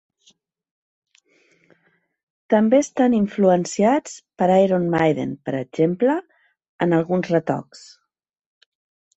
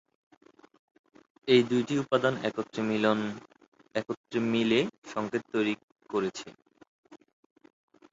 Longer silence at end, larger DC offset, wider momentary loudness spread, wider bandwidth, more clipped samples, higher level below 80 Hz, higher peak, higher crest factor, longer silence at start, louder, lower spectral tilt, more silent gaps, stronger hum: first, 1.4 s vs 0.95 s; neither; second, 10 LU vs 13 LU; about the same, 8.2 kHz vs 7.8 kHz; neither; first, -62 dBFS vs -70 dBFS; first, -4 dBFS vs -10 dBFS; about the same, 18 dB vs 22 dB; first, 2.5 s vs 1.45 s; first, -20 LUFS vs -29 LUFS; about the same, -6.5 dB/octave vs -5.5 dB/octave; second, 6.69-6.79 s vs 3.68-3.72 s, 4.17-4.24 s, 4.98-5.02 s, 5.83-5.88 s, 6.87-7.03 s; neither